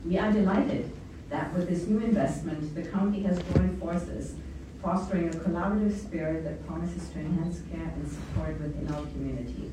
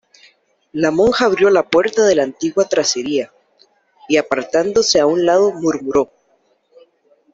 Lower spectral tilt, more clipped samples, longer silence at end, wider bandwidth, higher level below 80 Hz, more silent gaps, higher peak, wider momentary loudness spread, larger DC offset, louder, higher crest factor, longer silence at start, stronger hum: first, -8 dB/octave vs -3.5 dB/octave; neither; second, 0 s vs 1.3 s; first, 11 kHz vs 7.8 kHz; first, -42 dBFS vs -52 dBFS; neither; second, -8 dBFS vs -2 dBFS; first, 10 LU vs 7 LU; neither; second, -30 LUFS vs -15 LUFS; first, 20 dB vs 14 dB; second, 0 s vs 0.75 s; neither